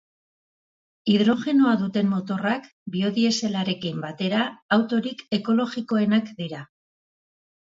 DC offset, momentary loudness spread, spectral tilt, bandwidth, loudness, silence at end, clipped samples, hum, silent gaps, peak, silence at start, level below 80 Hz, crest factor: under 0.1%; 10 LU; -5.5 dB/octave; 7.8 kHz; -24 LUFS; 1.1 s; under 0.1%; none; 2.72-2.86 s, 4.62-4.69 s; -8 dBFS; 1.05 s; -68 dBFS; 18 dB